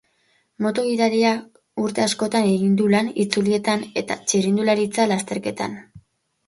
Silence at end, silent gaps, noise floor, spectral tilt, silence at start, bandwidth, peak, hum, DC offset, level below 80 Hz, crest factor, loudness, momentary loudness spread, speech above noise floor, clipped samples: 0.5 s; none; -64 dBFS; -4.5 dB/octave; 0.6 s; 11.5 kHz; -2 dBFS; none; under 0.1%; -64 dBFS; 20 dB; -21 LUFS; 9 LU; 44 dB; under 0.1%